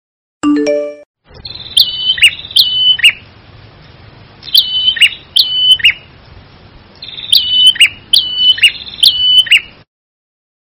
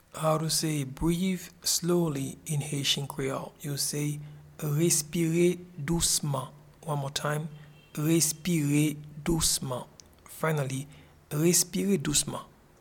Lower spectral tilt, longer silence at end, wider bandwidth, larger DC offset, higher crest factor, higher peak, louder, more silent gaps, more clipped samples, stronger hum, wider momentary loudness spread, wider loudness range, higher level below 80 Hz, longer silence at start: second, -1 dB/octave vs -4 dB/octave; first, 0.95 s vs 0.35 s; about the same, over 20 kHz vs 18.5 kHz; neither; second, 12 dB vs 20 dB; first, 0 dBFS vs -10 dBFS; first, -8 LUFS vs -28 LUFS; first, 1.06-1.14 s vs none; first, 2% vs under 0.1%; neither; about the same, 13 LU vs 12 LU; about the same, 3 LU vs 2 LU; about the same, -46 dBFS vs -50 dBFS; first, 0.45 s vs 0.15 s